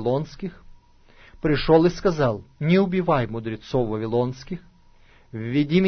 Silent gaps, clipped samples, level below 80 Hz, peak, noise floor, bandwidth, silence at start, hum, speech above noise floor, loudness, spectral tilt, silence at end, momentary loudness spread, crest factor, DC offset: none; under 0.1%; -42 dBFS; -4 dBFS; -52 dBFS; 6.6 kHz; 0 s; none; 31 dB; -23 LUFS; -7.5 dB/octave; 0 s; 17 LU; 18 dB; under 0.1%